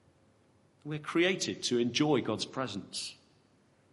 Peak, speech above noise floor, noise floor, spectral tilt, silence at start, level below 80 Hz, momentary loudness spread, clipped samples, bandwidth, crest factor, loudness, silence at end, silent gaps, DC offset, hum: -16 dBFS; 35 dB; -67 dBFS; -4 dB/octave; 0.85 s; -76 dBFS; 13 LU; under 0.1%; 11.5 kHz; 18 dB; -32 LUFS; 0.8 s; none; under 0.1%; none